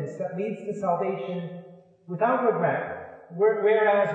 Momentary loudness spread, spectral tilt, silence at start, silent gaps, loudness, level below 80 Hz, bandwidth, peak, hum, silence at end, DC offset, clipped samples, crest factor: 18 LU; -7.5 dB/octave; 0 s; none; -25 LUFS; -74 dBFS; 8 kHz; -10 dBFS; none; 0 s; under 0.1%; under 0.1%; 16 dB